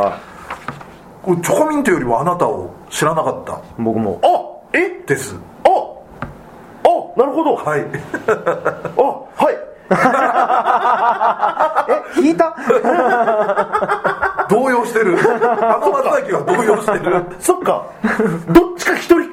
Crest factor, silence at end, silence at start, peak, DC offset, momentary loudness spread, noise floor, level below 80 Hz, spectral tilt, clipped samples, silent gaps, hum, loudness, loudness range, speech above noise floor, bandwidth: 16 dB; 0 s; 0 s; 0 dBFS; under 0.1%; 11 LU; -38 dBFS; -46 dBFS; -5.5 dB/octave; 0.2%; none; none; -16 LUFS; 3 LU; 22 dB; 16 kHz